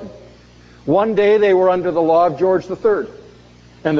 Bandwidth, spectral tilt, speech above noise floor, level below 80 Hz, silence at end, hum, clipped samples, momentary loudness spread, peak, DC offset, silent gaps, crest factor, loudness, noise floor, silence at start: 7 kHz; -7.5 dB/octave; 30 dB; -52 dBFS; 0 s; 60 Hz at -45 dBFS; under 0.1%; 14 LU; -2 dBFS; under 0.1%; none; 14 dB; -16 LUFS; -44 dBFS; 0 s